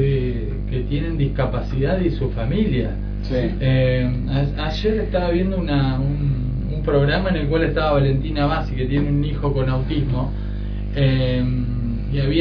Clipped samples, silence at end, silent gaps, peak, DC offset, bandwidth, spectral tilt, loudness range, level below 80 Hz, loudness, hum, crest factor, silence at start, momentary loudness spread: under 0.1%; 0 s; none; -4 dBFS; under 0.1%; 5.4 kHz; -9 dB/octave; 2 LU; -26 dBFS; -21 LUFS; 50 Hz at -25 dBFS; 14 dB; 0 s; 6 LU